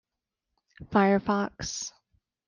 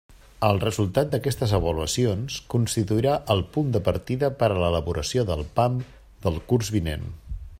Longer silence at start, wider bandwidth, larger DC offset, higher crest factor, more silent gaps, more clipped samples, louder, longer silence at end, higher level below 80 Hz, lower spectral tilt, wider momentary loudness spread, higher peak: first, 0.8 s vs 0.1 s; second, 10 kHz vs 16 kHz; neither; about the same, 20 dB vs 20 dB; neither; neither; about the same, -27 LUFS vs -25 LUFS; first, 0.6 s vs 0 s; second, -58 dBFS vs -42 dBFS; about the same, -5 dB/octave vs -6 dB/octave; first, 12 LU vs 7 LU; second, -10 dBFS vs -4 dBFS